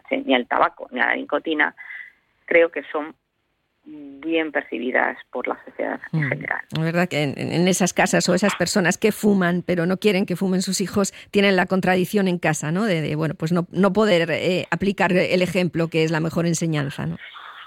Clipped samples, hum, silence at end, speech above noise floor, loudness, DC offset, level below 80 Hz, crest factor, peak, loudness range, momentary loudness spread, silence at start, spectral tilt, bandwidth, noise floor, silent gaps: under 0.1%; none; 0 s; 51 dB; -21 LUFS; under 0.1%; -58 dBFS; 18 dB; -4 dBFS; 5 LU; 10 LU; 0.1 s; -5 dB/octave; 16.5 kHz; -72 dBFS; none